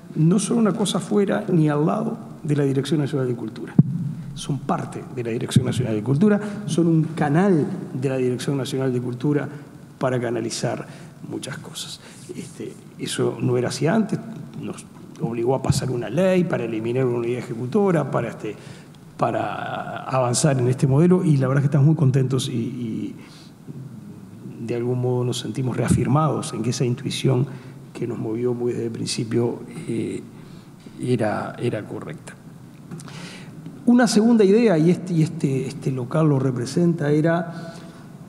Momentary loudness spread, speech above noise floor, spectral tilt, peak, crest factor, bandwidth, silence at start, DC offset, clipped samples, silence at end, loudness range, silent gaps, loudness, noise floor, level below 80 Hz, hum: 19 LU; 21 dB; -6.5 dB/octave; -2 dBFS; 20 dB; 13 kHz; 0.05 s; under 0.1%; under 0.1%; 0 s; 8 LU; none; -22 LUFS; -42 dBFS; -54 dBFS; none